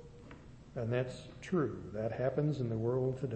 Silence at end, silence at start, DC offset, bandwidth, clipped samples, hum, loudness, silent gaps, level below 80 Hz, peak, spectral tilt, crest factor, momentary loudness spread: 0 s; 0 s; under 0.1%; 8.4 kHz; under 0.1%; none; -36 LUFS; none; -60 dBFS; -20 dBFS; -8.5 dB/octave; 16 dB; 20 LU